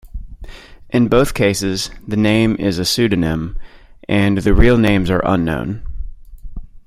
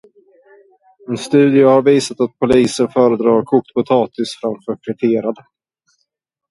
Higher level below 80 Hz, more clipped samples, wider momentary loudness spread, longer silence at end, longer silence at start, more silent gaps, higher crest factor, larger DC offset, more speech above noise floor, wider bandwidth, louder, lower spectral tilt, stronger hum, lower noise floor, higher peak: first, -26 dBFS vs -52 dBFS; neither; first, 21 LU vs 14 LU; second, 0.1 s vs 1.15 s; second, 0.05 s vs 1.1 s; neither; about the same, 16 dB vs 16 dB; neither; second, 21 dB vs 57 dB; first, 15.5 kHz vs 11.5 kHz; about the same, -16 LUFS vs -15 LUFS; about the same, -5.5 dB/octave vs -6 dB/octave; neither; second, -35 dBFS vs -72 dBFS; about the same, 0 dBFS vs 0 dBFS